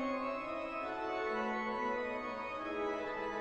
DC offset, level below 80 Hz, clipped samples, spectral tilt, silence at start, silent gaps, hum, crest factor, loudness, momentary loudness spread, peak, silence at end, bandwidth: under 0.1%; -64 dBFS; under 0.1%; -5 dB/octave; 0 s; none; none; 12 dB; -38 LUFS; 4 LU; -26 dBFS; 0 s; 9 kHz